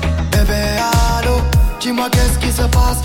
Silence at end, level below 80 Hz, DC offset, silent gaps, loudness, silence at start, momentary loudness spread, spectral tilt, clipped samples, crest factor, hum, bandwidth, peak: 0 s; -16 dBFS; under 0.1%; none; -15 LUFS; 0 s; 2 LU; -5 dB/octave; under 0.1%; 10 dB; none; 17 kHz; -2 dBFS